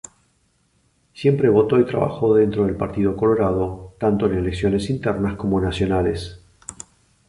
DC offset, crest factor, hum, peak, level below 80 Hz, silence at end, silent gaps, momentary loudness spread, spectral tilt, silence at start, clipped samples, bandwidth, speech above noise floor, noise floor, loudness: under 0.1%; 16 dB; none; -4 dBFS; -40 dBFS; 0.55 s; none; 20 LU; -7.5 dB/octave; 1.15 s; under 0.1%; 11 kHz; 44 dB; -63 dBFS; -20 LUFS